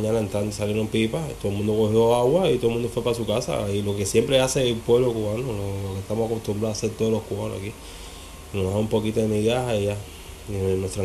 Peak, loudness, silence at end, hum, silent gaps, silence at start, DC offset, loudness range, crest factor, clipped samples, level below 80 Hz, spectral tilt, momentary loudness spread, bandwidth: -6 dBFS; -24 LUFS; 0 s; none; none; 0 s; under 0.1%; 6 LU; 16 dB; under 0.1%; -44 dBFS; -5.5 dB/octave; 13 LU; 14.5 kHz